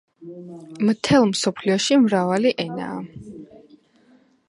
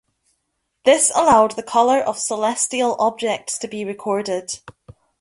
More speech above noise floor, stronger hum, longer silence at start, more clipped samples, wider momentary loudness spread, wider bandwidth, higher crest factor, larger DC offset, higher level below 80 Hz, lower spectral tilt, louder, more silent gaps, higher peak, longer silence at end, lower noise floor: second, 36 dB vs 55 dB; neither; second, 0.2 s vs 0.85 s; neither; first, 22 LU vs 12 LU; about the same, 11.5 kHz vs 11.5 kHz; about the same, 18 dB vs 18 dB; neither; about the same, -58 dBFS vs -58 dBFS; first, -5 dB/octave vs -2.5 dB/octave; about the same, -20 LUFS vs -18 LUFS; neither; about the same, -4 dBFS vs -2 dBFS; first, 1.05 s vs 0.5 s; second, -56 dBFS vs -73 dBFS